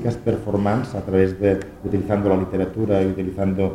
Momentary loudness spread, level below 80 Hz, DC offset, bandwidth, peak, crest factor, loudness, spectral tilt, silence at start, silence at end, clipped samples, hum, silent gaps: 5 LU; -44 dBFS; under 0.1%; 11.5 kHz; -4 dBFS; 18 dB; -21 LUFS; -9 dB/octave; 0 s; 0 s; under 0.1%; none; none